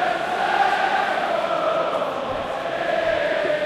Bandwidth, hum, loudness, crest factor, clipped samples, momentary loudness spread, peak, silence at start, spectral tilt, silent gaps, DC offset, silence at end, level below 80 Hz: 14 kHz; none; -22 LUFS; 14 dB; under 0.1%; 7 LU; -8 dBFS; 0 s; -4 dB/octave; none; under 0.1%; 0 s; -54 dBFS